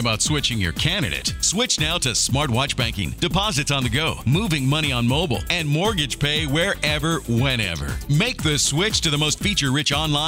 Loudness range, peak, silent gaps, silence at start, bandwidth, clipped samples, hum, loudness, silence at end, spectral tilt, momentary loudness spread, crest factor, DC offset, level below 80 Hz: 1 LU; -4 dBFS; none; 0 s; 16 kHz; under 0.1%; none; -20 LUFS; 0 s; -3.5 dB/octave; 3 LU; 18 dB; under 0.1%; -36 dBFS